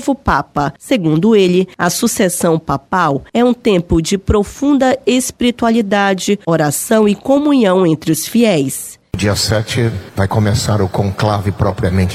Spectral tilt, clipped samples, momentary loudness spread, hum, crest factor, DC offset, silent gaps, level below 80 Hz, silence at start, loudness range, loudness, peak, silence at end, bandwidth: -5.5 dB/octave; under 0.1%; 6 LU; none; 14 dB; under 0.1%; none; -34 dBFS; 0 s; 2 LU; -14 LUFS; 0 dBFS; 0 s; 16 kHz